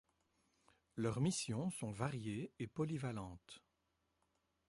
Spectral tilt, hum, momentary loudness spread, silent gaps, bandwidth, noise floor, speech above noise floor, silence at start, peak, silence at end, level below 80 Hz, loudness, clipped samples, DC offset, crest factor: -5.5 dB/octave; none; 16 LU; none; 11.5 kHz; -84 dBFS; 42 dB; 0.95 s; -24 dBFS; 1.1 s; -70 dBFS; -43 LUFS; under 0.1%; under 0.1%; 20 dB